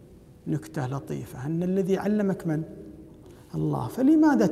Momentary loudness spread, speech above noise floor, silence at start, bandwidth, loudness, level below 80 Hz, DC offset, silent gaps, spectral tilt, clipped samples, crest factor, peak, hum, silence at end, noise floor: 18 LU; 23 dB; 0.1 s; 14 kHz; -26 LUFS; -56 dBFS; under 0.1%; none; -8 dB/octave; under 0.1%; 16 dB; -10 dBFS; none; 0 s; -48 dBFS